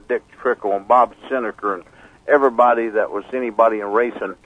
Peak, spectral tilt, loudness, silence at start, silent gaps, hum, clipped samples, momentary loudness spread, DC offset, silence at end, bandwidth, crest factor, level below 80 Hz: -2 dBFS; -6.5 dB/octave; -19 LUFS; 0.1 s; none; none; under 0.1%; 10 LU; under 0.1%; 0.1 s; 9.6 kHz; 18 dB; -58 dBFS